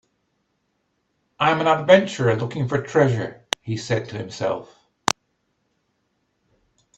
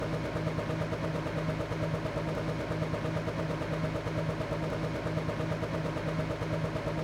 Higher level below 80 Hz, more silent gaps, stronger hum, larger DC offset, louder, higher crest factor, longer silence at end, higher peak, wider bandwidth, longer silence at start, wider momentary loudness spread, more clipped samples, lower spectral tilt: second, -60 dBFS vs -48 dBFS; neither; neither; neither; first, -21 LUFS vs -34 LUFS; first, 24 dB vs 14 dB; first, 2.3 s vs 0 s; first, 0 dBFS vs -18 dBFS; about the same, 14 kHz vs 13 kHz; first, 1.4 s vs 0 s; first, 12 LU vs 1 LU; neither; second, -5 dB/octave vs -7 dB/octave